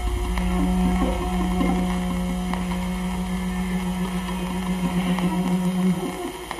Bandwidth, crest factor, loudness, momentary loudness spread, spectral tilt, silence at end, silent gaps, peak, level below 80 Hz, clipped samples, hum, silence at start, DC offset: 13 kHz; 16 dB; -24 LUFS; 5 LU; -6.5 dB/octave; 0 s; none; -8 dBFS; -32 dBFS; under 0.1%; none; 0 s; under 0.1%